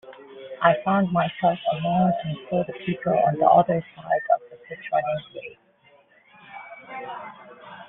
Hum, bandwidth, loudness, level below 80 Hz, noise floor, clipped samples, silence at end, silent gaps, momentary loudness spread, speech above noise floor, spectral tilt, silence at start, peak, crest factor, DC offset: none; 3.9 kHz; -23 LUFS; -62 dBFS; -58 dBFS; under 0.1%; 0.05 s; none; 22 LU; 35 dB; -5.5 dB/octave; 0.05 s; -4 dBFS; 20 dB; under 0.1%